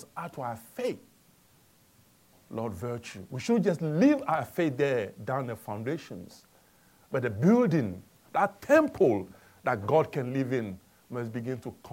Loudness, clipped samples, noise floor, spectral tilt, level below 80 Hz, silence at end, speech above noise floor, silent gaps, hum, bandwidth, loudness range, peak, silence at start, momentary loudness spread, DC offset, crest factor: -29 LUFS; under 0.1%; -62 dBFS; -7.5 dB/octave; -68 dBFS; 0 s; 34 dB; none; none; 17 kHz; 7 LU; -10 dBFS; 0 s; 16 LU; under 0.1%; 20 dB